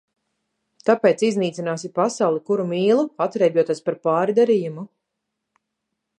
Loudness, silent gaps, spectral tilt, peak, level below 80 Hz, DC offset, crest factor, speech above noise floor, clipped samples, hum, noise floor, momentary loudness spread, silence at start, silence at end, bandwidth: -20 LUFS; none; -6 dB/octave; -4 dBFS; -76 dBFS; under 0.1%; 18 dB; 60 dB; under 0.1%; none; -80 dBFS; 8 LU; 0.85 s; 1.35 s; 9.8 kHz